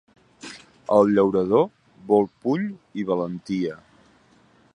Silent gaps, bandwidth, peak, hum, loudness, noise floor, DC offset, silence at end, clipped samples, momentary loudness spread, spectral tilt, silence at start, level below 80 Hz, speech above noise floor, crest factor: none; 10.5 kHz; -4 dBFS; none; -22 LUFS; -57 dBFS; under 0.1%; 1 s; under 0.1%; 21 LU; -7.5 dB/octave; 0.45 s; -62 dBFS; 36 dB; 20 dB